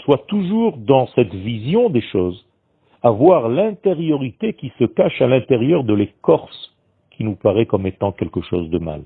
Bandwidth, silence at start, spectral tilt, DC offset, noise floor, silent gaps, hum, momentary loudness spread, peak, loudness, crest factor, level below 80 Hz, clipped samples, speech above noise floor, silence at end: 4.5 kHz; 0 s; -11 dB/octave; under 0.1%; -59 dBFS; none; none; 10 LU; 0 dBFS; -18 LUFS; 18 dB; -50 dBFS; under 0.1%; 42 dB; 0 s